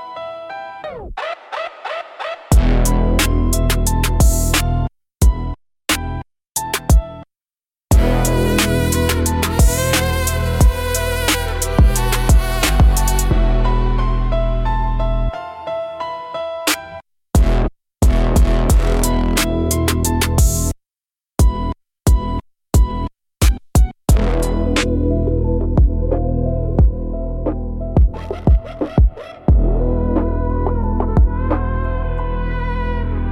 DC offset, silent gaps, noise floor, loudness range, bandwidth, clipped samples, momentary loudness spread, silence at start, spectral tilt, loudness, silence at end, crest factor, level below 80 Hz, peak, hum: under 0.1%; 6.51-6.55 s; under -90 dBFS; 4 LU; 17 kHz; under 0.1%; 11 LU; 0 s; -5 dB/octave; -18 LUFS; 0 s; 14 dB; -18 dBFS; -2 dBFS; none